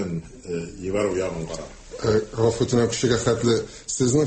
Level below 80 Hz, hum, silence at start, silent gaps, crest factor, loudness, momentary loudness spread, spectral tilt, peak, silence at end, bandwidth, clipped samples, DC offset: -46 dBFS; none; 0 s; none; 16 dB; -24 LUFS; 12 LU; -5 dB/octave; -6 dBFS; 0 s; 8.8 kHz; under 0.1%; under 0.1%